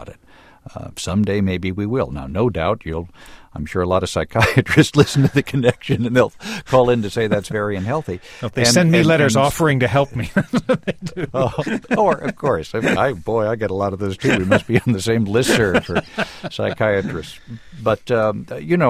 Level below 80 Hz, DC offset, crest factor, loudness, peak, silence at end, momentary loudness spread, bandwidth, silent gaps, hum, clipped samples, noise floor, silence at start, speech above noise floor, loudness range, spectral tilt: -42 dBFS; under 0.1%; 18 dB; -18 LUFS; 0 dBFS; 0 s; 13 LU; 15.5 kHz; none; none; under 0.1%; -48 dBFS; 0 s; 30 dB; 5 LU; -5.5 dB/octave